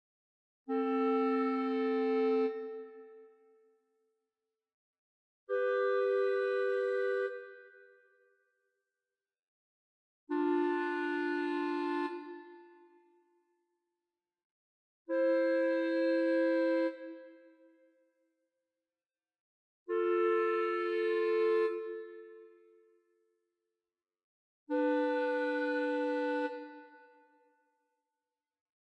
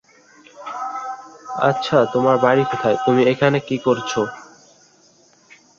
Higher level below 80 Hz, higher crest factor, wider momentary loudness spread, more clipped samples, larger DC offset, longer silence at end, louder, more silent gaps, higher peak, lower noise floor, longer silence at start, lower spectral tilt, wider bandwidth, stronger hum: second, under -90 dBFS vs -62 dBFS; about the same, 14 dB vs 18 dB; about the same, 16 LU vs 16 LU; neither; neither; first, 1.95 s vs 1.35 s; second, -33 LUFS vs -18 LUFS; first, 4.74-5.47 s, 9.39-10.27 s, 14.44-15.05 s, 19.40-19.86 s, 24.24-24.66 s vs none; second, -22 dBFS vs -2 dBFS; first, under -90 dBFS vs -54 dBFS; first, 0.7 s vs 0.55 s; about the same, -5 dB/octave vs -6 dB/octave; first, 8.8 kHz vs 7.6 kHz; neither